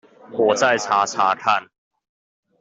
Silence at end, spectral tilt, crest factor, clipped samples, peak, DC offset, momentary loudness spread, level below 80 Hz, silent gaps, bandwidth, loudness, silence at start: 0.95 s; -2.5 dB/octave; 18 dB; under 0.1%; -4 dBFS; under 0.1%; 5 LU; -68 dBFS; none; 8.2 kHz; -19 LUFS; 0.3 s